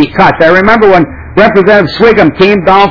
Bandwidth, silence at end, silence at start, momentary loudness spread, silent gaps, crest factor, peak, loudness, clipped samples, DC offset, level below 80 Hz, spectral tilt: 5.4 kHz; 0 s; 0 s; 3 LU; none; 6 dB; 0 dBFS; -5 LUFS; 20%; under 0.1%; -30 dBFS; -7.5 dB/octave